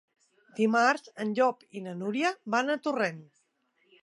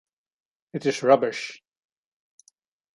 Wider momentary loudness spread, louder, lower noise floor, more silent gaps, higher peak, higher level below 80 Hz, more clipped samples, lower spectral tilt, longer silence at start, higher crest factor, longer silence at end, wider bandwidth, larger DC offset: about the same, 15 LU vs 17 LU; second, -28 LUFS vs -23 LUFS; first, -72 dBFS vs -65 dBFS; neither; second, -10 dBFS vs -4 dBFS; second, -86 dBFS vs -78 dBFS; neither; about the same, -5 dB/octave vs -5 dB/octave; second, 0.55 s vs 0.75 s; about the same, 22 dB vs 22 dB; second, 0.8 s vs 1.4 s; about the same, 11.5 kHz vs 11.5 kHz; neither